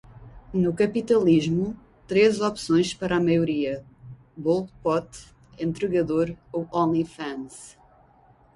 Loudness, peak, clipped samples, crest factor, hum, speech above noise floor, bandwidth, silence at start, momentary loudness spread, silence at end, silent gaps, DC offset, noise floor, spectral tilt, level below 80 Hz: -24 LUFS; -8 dBFS; under 0.1%; 16 dB; none; 33 dB; 11.5 kHz; 0.2 s; 16 LU; 0.85 s; none; under 0.1%; -57 dBFS; -6.5 dB/octave; -54 dBFS